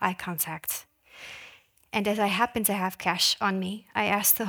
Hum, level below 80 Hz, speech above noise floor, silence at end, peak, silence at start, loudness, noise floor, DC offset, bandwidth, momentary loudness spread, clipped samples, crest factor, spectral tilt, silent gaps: none; -64 dBFS; 27 dB; 0 s; -6 dBFS; 0 s; -26 LUFS; -54 dBFS; under 0.1%; over 20 kHz; 19 LU; under 0.1%; 22 dB; -2.5 dB/octave; none